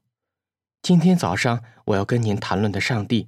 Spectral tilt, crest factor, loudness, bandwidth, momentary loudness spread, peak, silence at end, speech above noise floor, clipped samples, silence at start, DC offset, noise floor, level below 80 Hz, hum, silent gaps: -6 dB/octave; 16 dB; -21 LUFS; 13 kHz; 8 LU; -4 dBFS; 0 s; 68 dB; under 0.1%; 0.85 s; under 0.1%; -88 dBFS; -56 dBFS; none; none